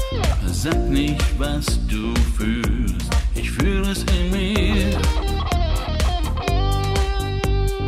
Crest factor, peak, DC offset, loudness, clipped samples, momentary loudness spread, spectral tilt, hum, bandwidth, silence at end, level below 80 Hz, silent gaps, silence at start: 12 dB; -8 dBFS; under 0.1%; -21 LUFS; under 0.1%; 3 LU; -5.5 dB/octave; none; 15 kHz; 0 s; -22 dBFS; none; 0 s